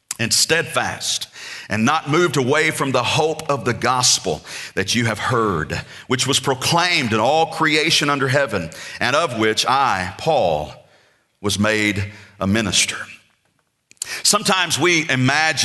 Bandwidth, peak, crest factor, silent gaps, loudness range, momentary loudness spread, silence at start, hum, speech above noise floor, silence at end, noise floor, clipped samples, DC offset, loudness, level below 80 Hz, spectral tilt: 12.5 kHz; -2 dBFS; 18 dB; none; 3 LU; 11 LU; 0.1 s; none; 47 dB; 0 s; -66 dBFS; under 0.1%; under 0.1%; -18 LUFS; -52 dBFS; -3 dB/octave